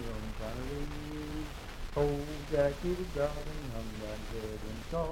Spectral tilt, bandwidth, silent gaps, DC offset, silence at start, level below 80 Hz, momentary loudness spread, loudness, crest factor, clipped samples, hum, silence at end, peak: -6 dB/octave; 16.5 kHz; none; under 0.1%; 0 s; -42 dBFS; 10 LU; -37 LUFS; 18 dB; under 0.1%; none; 0 s; -16 dBFS